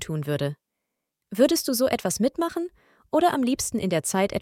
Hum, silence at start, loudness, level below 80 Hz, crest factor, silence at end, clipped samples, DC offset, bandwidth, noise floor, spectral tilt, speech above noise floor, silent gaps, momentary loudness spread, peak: none; 0 s; -24 LUFS; -58 dBFS; 18 dB; 0 s; under 0.1%; under 0.1%; 17 kHz; -82 dBFS; -4.5 dB/octave; 58 dB; none; 11 LU; -6 dBFS